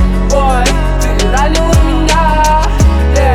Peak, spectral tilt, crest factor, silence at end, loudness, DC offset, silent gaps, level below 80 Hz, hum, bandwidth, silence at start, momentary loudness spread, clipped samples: 0 dBFS; -5 dB/octave; 8 dB; 0 s; -11 LUFS; under 0.1%; none; -12 dBFS; none; 14.5 kHz; 0 s; 3 LU; under 0.1%